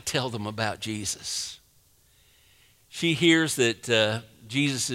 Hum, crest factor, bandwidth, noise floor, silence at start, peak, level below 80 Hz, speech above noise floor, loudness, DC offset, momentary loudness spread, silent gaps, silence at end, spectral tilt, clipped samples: none; 20 dB; 16 kHz; -61 dBFS; 0.05 s; -8 dBFS; -62 dBFS; 35 dB; -26 LUFS; under 0.1%; 11 LU; none; 0 s; -3.5 dB/octave; under 0.1%